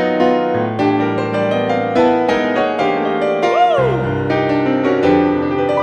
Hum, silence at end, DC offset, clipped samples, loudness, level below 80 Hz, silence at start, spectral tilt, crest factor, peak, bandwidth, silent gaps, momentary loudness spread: none; 0 s; under 0.1%; under 0.1%; -15 LUFS; -46 dBFS; 0 s; -7 dB/octave; 14 dB; -2 dBFS; 8.8 kHz; none; 4 LU